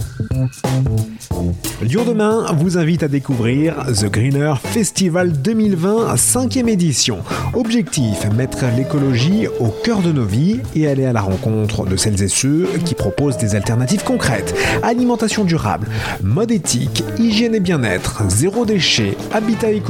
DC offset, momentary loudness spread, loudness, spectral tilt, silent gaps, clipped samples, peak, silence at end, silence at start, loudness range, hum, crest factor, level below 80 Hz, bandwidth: under 0.1%; 5 LU; -16 LUFS; -5 dB/octave; none; under 0.1%; 0 dBFS; 0 s; 0 s; 1 LU; none; 16 dB; -38 dBFS; 18 kHz